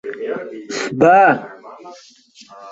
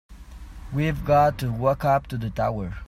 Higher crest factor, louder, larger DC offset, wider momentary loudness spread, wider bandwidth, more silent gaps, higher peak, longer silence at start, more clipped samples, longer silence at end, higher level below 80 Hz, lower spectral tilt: about the same, 16 dB vs 16 dB; first, -16 LUFS vs -23 LUFS; neither; first, 26 LU vs 12 LU; second, 8 kHz vs 15.5 kHz; neither; first, -2 dBFS vs -8 dBFS; about the same, 0.05 s vs 0.1 s; neither; about the same, 0 s vs 0.05 s; second, -58 dBFS vs -40 dBFS; second, -5 dB/octave vs -7.5 dB/octave